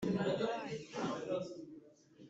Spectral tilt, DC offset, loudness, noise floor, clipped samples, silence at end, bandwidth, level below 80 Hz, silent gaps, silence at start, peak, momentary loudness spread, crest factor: -6 dB/octave; under 0.1%; -39 LUFS; -61 dBFS; under 0.1%; 0 s; 8 kHz; -74 dBFS; none; 0 s; -24 dBFS; 17 LU; 16 dB